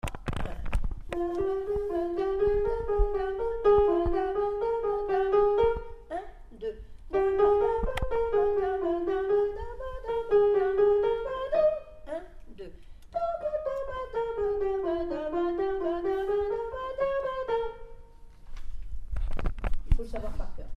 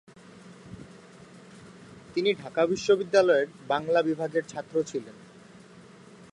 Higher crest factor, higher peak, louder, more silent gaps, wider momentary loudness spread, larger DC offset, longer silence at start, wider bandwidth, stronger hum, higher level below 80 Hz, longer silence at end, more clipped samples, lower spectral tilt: about the same, 18 dB vs 20 dB; about the same, -10 dBFS vs -8 dBFS; second, -29 LUFS vs -26 LUFS; neither; second, 15 LU vs 27 LU; neither; second, 0.05 s vs 0.45 s; second, 9.8 kHz vs 11 kHz; neither; first, -36 dBFS vs -66 dBFS; second, 0.05 s vs 1.2 s; neither; first, -7.5 dB/octave vs -5 dB/octave